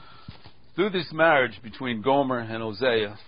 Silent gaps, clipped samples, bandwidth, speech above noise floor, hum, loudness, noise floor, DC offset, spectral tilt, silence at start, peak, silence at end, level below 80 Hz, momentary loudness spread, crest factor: none; under 0.1%; 5.4 kHz; 23 dB; none; -24 LUFS; -47 dBFS; 0.5%; -9.5 dB/octave; 0.3 s; -6 dBFS; 0.1 s; -58 dBFS; 12 LU; 20 dB